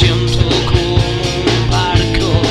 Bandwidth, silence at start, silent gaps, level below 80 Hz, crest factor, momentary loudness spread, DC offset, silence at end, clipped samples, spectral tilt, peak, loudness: 11.5 kHz; 0 s; none; -22 dBFS; 12 dB; 2 LU; 0.8%; 0 s; under 0.1%; -5.5 dB/octave; 0 dBFS; -14 LUFS